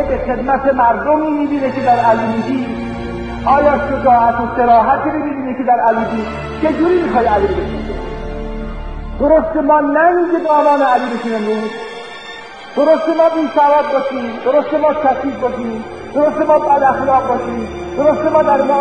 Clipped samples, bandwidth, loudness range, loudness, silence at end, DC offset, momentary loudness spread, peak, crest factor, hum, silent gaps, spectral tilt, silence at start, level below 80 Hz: under 0.1%; 9.2 kHz; 2 LU; -14 LUFS; 0 s; 0.5%; 13 LU; 0 dBFS; 14 dB; none; none; -7 dB/octave; 0 s; -34 dBFS